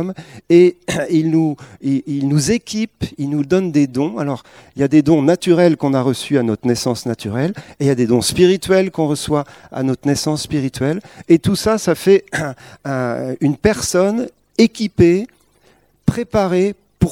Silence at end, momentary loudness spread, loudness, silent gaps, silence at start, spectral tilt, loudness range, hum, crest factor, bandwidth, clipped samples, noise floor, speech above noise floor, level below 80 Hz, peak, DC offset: 0 s; 10 LU; -17 LUFS; none; 0 s; -6 dB/octave; 2 LU; none; 16 dB; 16.5 kHz; under 0.1%; -55 dBFS; 39 dB; -42 dBFS; 0 dBFS; under 0.1%